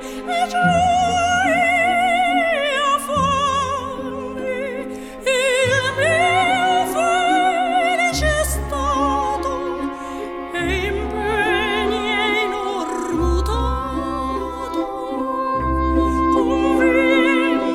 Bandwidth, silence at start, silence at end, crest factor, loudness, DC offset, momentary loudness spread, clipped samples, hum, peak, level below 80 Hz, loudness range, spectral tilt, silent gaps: 16.5 kHz; 0 s; 0 s; 16 dB; -19 LUFS; under 0.1%; 9 LU; under 0.1%; none; -4 dBFS; -32 dBFS; 5 LU; -4.5 dB/octave; none